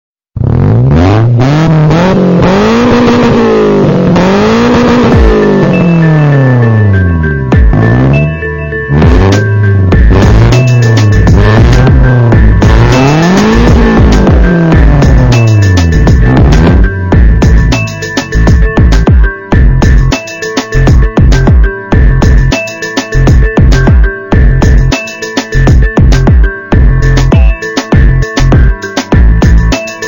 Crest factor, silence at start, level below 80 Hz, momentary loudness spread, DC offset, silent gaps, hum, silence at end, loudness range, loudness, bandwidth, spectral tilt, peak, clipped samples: 4 dB; 0.35 s; -10 dBFS; 5 LU; under 0.1%; none; none; 0 s; 3 LU; -6 LUFS; 16 kHz; -7 dB/octave; 0 dBFS; 1%